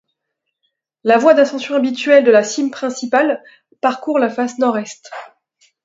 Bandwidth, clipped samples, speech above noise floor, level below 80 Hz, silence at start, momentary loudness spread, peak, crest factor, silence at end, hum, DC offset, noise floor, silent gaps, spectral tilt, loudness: 7.8 kHz; under 0.1%; 62 dB; -68 dBFS; 1.05 s; 14 LU; 0 dBFS; 16 dB; 0.6 s; none; under 0.1%; -76 dBFS; none; -4 dB/octave; -15 LUFS